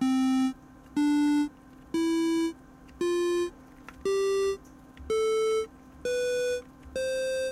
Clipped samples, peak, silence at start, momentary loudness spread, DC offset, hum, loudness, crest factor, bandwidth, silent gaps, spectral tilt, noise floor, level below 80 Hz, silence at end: under 0.1%; -18 dBFS; 0 s; 14 LU; under 0.1%; none; -29 LUFS; 10 dB; 15 kHz; none; -4 dB/octave; -50 dBFS; -56 dBFS; 0 s